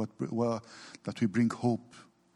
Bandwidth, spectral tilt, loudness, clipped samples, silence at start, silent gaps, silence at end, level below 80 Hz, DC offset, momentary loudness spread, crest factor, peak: 11 kHz; -7 dB/octave; -32 LUFS; under 0.1%; 0 s; none; 0.35 s; -74 dBFS; under 0.1%; 13 LU; 16 dB; -16 dBFS